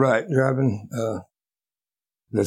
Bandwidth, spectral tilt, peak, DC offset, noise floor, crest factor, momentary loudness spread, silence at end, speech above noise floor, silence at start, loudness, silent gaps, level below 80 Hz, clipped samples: 13 kHz; -7.5 dB/octave; -6 dBFS; under 0.1%; under -90 dBFS; 18 dB; 9 LU; 0 s; over 68 dB; 0 s; -23 LUFS; none; -66 dBFS; under 0.1%